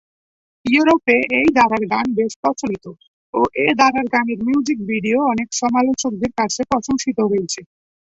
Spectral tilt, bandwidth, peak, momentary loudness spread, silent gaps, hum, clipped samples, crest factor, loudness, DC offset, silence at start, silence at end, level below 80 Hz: -4 dB/octave; 8.2 kHz; 0 dBFS; 7 LU; 2.36-2.43 s, 3.08-3.33 s; none; under 0.1%; 18 dB; -18 LUFS; under 0.1%; 0.65 s; 0.55 s; -52 dBFS